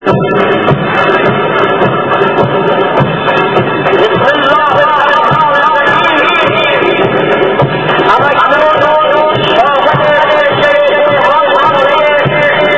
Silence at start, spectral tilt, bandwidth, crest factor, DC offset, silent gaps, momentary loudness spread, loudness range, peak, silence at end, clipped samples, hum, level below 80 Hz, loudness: 0 s; -6.5 dB/octave; 8 kHz; 8 dB; 0.9%; none; 3 LU; 2 LU; 0 dBFS; 0 s; 1%; none; -42 dBFS; -8 LUFS